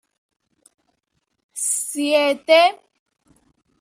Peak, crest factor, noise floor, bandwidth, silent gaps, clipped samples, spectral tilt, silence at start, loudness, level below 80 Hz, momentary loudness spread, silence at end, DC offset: -2 dBFS; 20 dB; -72 dBFS; 15.5 kHz; none; under 0.1%; 0.5 dB/octave; 1.55 s; -18 LUFS; -76 dBFS; 9 LU; 1.05 s; under 0.1%